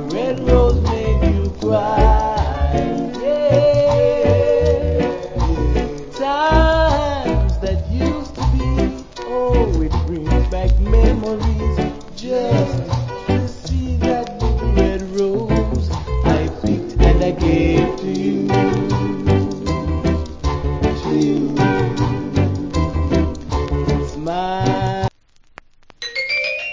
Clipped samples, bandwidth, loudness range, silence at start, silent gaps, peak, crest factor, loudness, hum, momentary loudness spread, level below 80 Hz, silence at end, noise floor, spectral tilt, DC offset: under 0.1%; 7.6 kHz; 4 LU; 0 s; none; 0 dBFS; 16 dB; -18 LUFS; none; 7 LU; -22 dBFS; 0 s; -50 dBFS; -7.5 dB/octave; under 0.1%